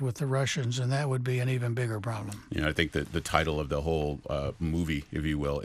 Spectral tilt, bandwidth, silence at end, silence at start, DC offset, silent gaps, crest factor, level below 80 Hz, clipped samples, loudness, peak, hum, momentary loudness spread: -5.5 dB/octave; 14.5 kHz; 0 s; 0 s; under 0.1%; none; 22 dB; -44 dBFS; under 0.1%; -30 LUFS; -8 dBFS; none; 5 LU